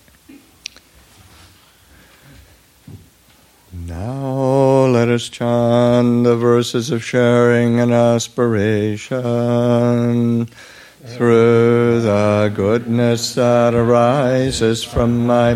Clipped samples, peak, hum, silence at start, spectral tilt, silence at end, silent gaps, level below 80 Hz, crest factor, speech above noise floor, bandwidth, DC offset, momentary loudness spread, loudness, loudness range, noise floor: under 0.1%; -2 dBFS; none; 0.3 s; -6.5 dB/octave; 0 s; none; -44 dBFS; 14 dB; 36 dB; 14 kHz; under 0.1%; 9 LU; -15 LUFS; 5 LU; -50 dBFS